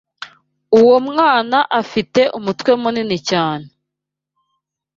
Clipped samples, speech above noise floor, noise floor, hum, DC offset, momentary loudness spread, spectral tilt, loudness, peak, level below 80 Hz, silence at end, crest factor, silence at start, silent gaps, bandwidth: under 0.1%; 67 dB; -82 dBFS; 50 Hz at -45 dBFS; under 0.1%; 14 LU; -5 dB/octave; -15 LUFS; -2 dBFS; -58 dBFS; 1.3 s; 16 dB; 0.2 s; none; 7.6 kHz